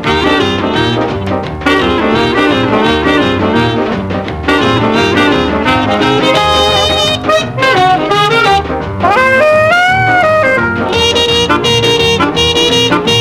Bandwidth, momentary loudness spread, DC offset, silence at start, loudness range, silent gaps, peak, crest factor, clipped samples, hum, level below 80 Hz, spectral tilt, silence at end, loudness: 16.5 kHz; 5 LU; under 0.1%; 0 s; 2 LU; none; 0 dBFS; 10 dB; under 0.1%; none; -30 dBFS; -4.5 dB/octave; 0 s; -10 LUFS